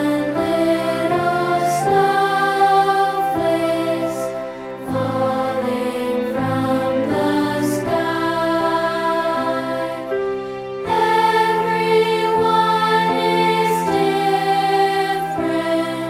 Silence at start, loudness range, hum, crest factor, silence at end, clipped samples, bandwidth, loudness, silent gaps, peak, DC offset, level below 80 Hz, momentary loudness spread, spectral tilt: 0 s; 4 LU; none; 14 dB; 0 s; under 0.1%; 16.5 kHz; -18 LUFS; none; -4 dBFS; under 0.1%; -52 dBFS; 7 LU; -5 dB/octave